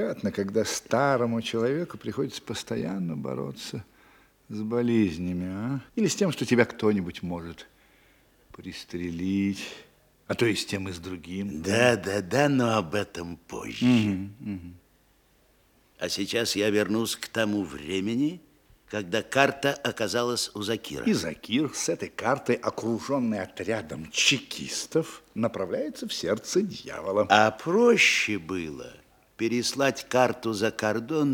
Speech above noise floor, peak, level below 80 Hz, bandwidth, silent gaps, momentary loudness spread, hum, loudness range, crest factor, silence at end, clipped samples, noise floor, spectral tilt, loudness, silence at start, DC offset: 36 dB; -4 dBFS; -62 dBFS; 18.5 kHz; none; 14 LU; none; 7 LU; 24 dB; 0 s; under 0.1%; -63 dBFS; -4.5 dB/octave; -27 LUFS; 0 s; under 0.1%